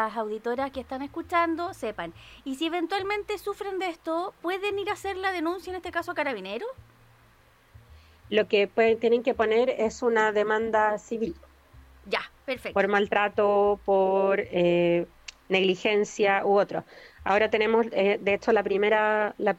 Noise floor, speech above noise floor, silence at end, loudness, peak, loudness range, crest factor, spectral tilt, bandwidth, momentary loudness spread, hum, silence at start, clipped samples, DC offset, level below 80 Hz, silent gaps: -59 dBFS; 33 dB; 0.05 s; -26 LUFS; -8 dBFS; 7 LU; 18 dB; -5 dB/octave; 15 kHz; 11 LU; none; 0 s; under 0.1%; under 0.1%; -58 dBFS; none